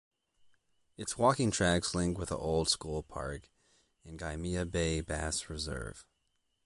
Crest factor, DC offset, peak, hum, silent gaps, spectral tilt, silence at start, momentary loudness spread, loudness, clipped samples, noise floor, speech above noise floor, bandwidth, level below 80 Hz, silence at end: 22 dB; under 0.1%; -14 dBFS; none; none; -4 dB/octave; 1 s; 13 LU; -33 LUFS; under 0.1%; -79 dBFS; 45 dB; 11.5 kHz; -48 dBFS; 0.65 s